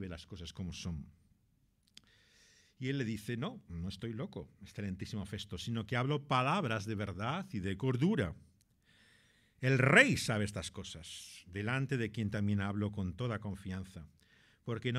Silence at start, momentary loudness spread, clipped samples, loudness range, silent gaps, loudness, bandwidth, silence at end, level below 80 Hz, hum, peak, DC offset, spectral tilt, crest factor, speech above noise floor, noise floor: 0 s; 15 LU; under 0.1%; 11 LU; none; -35 LUFS; 14.5 kHz; 0 s; -60 dBFS; none; -10 dBFS; under 0.1%; -5.5 dB/octave; 26 dB; 38 dB; -74 dBFS